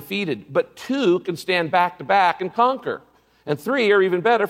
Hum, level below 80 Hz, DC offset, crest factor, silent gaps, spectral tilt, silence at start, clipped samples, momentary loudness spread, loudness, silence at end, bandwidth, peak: none; -68 dBFS; under 0.1%; 16 dB; none; -5.5 dB/octave; 0 s; under 0.1%; 10 LU; -20 LUFS; 0 s; 16 kHz; -4 dBFS